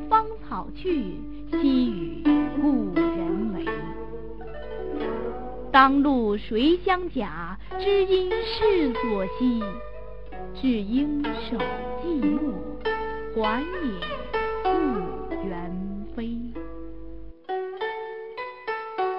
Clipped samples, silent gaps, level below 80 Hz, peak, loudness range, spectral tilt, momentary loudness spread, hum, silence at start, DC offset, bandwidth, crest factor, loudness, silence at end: under 0.1%; none; -42 dBFS; -2 dBFS; 7 LU; -8.5 dB/octave; 15 LU; none; 0 s; 1%; 5.6 kHz; 24 dB; -26 LUFS; 0 s